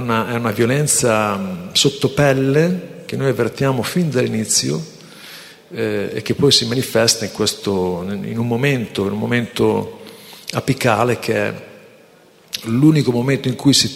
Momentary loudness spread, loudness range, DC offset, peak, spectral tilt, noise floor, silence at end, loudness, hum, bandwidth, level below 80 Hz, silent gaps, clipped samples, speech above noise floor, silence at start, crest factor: 14 LU; 3 LU; under 0.1%; 0 dBFS; -4.5 dB/octave; -48 dBFS; 0 s; -17 LUFS; none; 16 kHz; -52 dBFS; none; under 0.1%; 31 dB; 0 s; 18 dB